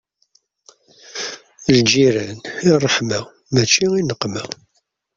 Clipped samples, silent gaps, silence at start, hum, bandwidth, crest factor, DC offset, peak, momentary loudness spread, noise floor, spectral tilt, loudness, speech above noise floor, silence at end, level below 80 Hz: under 0.1%; none; 1.1 s; none; 7.8 kHz; 18 dB; under 0.1%; -2 dBFS; 15 LU; -62 dBFS; -4 dB/octave; -17 LUFS; 45 dB; 0.65 s; -54 dBFS